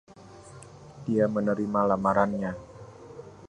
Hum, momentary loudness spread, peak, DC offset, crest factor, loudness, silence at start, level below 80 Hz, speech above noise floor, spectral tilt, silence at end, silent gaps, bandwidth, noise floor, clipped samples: none; 23 LU; -8 dBFS; under 0.1%; 22 dB; -26 LUFS; 0.2 s; -58 dBFS; 23 dB; -8 dB/octave; 0 s; none; 10.5 kHz; -48 dBFS; under 0.1%